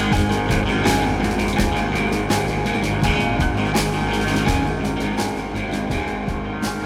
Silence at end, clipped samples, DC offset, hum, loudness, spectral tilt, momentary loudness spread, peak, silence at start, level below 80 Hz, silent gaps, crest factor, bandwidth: 0 s; under 0.1%; under 0.1%; none; -21 LUFS; -5.5 dB/octave; 6 LU; -4 dBFS; 0 s; -28 dBFS; none; 16 dB; 17.5 kHz